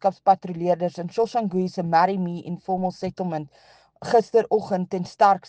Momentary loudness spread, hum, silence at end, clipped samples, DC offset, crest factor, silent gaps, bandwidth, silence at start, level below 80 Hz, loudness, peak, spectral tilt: 10 LU; none; 0 s; under 0.1%; under 0.1%; 18 dB; none; 9 kHz; 0.05 s; -64 dBFS; -23 LUFS; -4 dBFS; -7 dB/octave